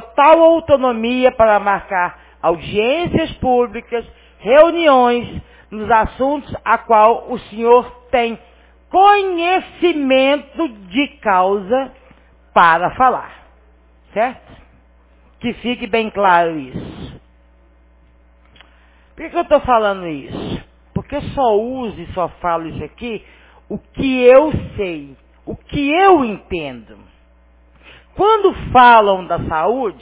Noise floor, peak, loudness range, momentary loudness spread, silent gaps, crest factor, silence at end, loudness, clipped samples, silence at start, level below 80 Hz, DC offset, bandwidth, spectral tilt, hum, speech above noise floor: -49 dBFS; 0 dBFS; 7 LU; 18 LU; none; 16 dB; 0.1 s; -15 LUFS; under 0.1%; 0 s; -40 dBFS; under 0.1%; 4 kHz; -9.5 dB/octave; none; 35 dB